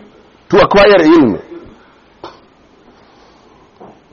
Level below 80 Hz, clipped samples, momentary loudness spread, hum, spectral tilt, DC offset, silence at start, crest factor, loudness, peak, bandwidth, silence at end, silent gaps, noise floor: -40 dBFS; under 0.1%; 8 LU; none; -4 dB/octave; under 0.1%; 0.5 s; 14 dB; -8 LUFS; 0 dBFS; 7 kHz; 1.85 s; none; -46 dBFS